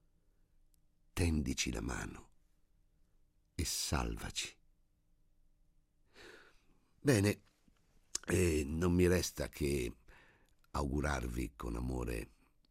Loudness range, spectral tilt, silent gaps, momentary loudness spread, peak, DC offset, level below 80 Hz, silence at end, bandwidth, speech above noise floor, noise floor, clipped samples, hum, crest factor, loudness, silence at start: 7 LU; -5 dB/octave; none; 15 LU; -16 dBFS; under 0.1%; -50 dBFS; 0.45 s; 16 kHz; 37 dB; -72 dBFS; under 0.1%; none; 22 dB; -37 LUFS; 1.15 s